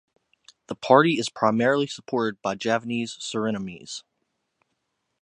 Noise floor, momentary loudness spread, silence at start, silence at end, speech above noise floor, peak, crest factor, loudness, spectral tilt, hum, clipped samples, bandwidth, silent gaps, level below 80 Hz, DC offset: -77 dBFS; 18 LU; 0.7 s; 1.2 s; 53 dB; -2 dBFS; 24 dB; -24 LUFS; -5 dB/octave; none; under 0.1%; 11 kHz; none; -68 dBFS; under 0.1%